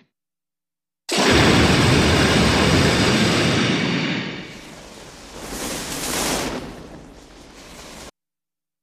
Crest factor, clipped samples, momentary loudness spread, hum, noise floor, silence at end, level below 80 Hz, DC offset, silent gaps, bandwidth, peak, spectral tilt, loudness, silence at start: 20 dB; under 0.1%; 24 LU; none; under -90 dBFS; 0.7 s; -36 dBFS; under 0.1%; none; 15.5 kHz; -2 dBFS; -4 dB/octave; -18 LUFS; 1.1 s